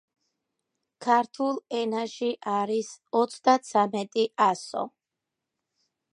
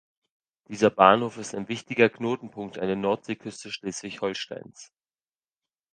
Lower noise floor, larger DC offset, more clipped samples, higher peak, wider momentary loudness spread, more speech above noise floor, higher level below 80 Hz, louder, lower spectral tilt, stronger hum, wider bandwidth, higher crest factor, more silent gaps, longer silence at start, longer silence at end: second, -86 dBFS vs under -90 dBFS; neither; neither; second, -8 dBFS vs 0 dBFS; second, 9 LU vs 17 LU; second, 60 dB vs over 64 dB; second, -82 dBFS vs -66 dBFS; about the same, -27 LUFS vs -25 LUFS; about the same, -4.5 dB/octave vs -4.5 dB/octave; neither; first, 11 kHz vs 9.8 kHz; second, 20 dB vs 26 dB; neither; first, 1 s vs 0.7 s; first, 1.25 s vs 1.1 s